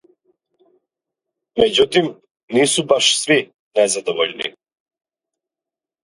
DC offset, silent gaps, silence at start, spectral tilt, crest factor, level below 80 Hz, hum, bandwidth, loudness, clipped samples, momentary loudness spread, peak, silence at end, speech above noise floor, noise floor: under 0.1%; 2.31-2.35 s, 2.43-2.48 s, 3.59-3.71 s; 1.55 s; -2.5 dB/octave; 20 dB; -56 dBFS; none; 11.5 kHz; -17 LUFS; under 0.1%; 12 LU; 0 dBFS; 1.55 s; 72 dB; -88 dBFS